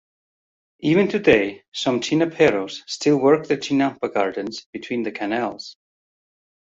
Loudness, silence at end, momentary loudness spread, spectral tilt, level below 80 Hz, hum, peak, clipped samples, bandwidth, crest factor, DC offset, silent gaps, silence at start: -21 LUFS; 0.95 s; 12 LU; -5 dB/octave; -58 dBFS; none; -2 dBFS; under 0.1%; 7.8 kHz; 20 dB; under 0.1%; 1.68-1.72 s, 4.66-4.73 s; 0.8 s